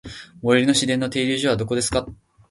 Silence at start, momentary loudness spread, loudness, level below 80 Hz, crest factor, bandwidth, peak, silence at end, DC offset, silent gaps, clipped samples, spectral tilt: 0.05 s; 11 LU; -20 LUFS; -46 dBFS; 20 dB; 11.5 kHz; -2 dBFS; 0.35 s; under 0.1%; none; under 0.1%; -4 dB/octave